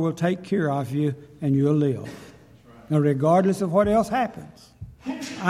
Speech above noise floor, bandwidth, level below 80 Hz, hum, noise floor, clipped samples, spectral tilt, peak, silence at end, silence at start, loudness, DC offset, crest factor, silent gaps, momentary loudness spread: 27 dB; 14 kHz; -52 dBFS; none; -49 dBFS; under 0.1%; -7.5 dB/octave; -4 dBFS; 0 s; 0 s; -23 LUFS; under 0.1%; 20 dB; none; 18 LU